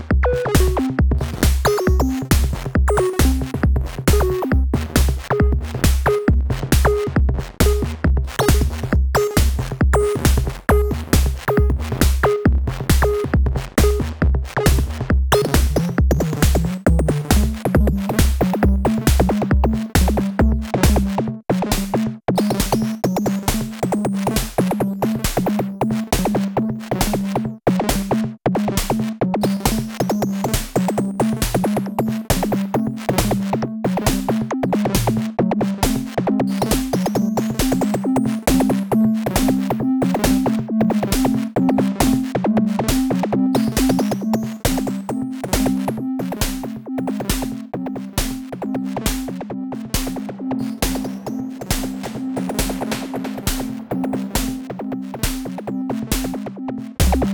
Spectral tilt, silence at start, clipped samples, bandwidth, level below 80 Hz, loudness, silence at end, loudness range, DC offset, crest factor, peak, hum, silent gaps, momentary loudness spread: -5.5 dB/octave; 0 s; under 0.1%; 20 kHz; -24 dBFS; -20 LUFS; 0 s; 6 LU; under 0.1%; 16 dB; -2 dBFS; none; none; 7 LU